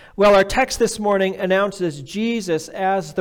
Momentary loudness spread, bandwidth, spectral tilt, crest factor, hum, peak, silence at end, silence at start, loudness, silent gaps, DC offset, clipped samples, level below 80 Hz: 10 LU; 18.5 kHz; -4.5 dB/octave; 14 dB; none; -6 dBFS; 0 s; 0.2 s; -19 LUFS; none; under 0.1%; under 0.1%; -42 dBFS